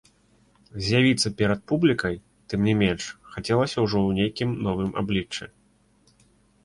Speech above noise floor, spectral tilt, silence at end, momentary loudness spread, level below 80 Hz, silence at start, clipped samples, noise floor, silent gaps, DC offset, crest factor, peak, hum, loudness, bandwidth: 38 dB; -5.5 dB/octave; 1.2 s; 14 LU; -48 dBFS; 0.75 s; under 0.1%; -62 dBFS; none; under 0.1%; 18 dB; -8 dBFS; none; -24 LUFS; 11.5 kHz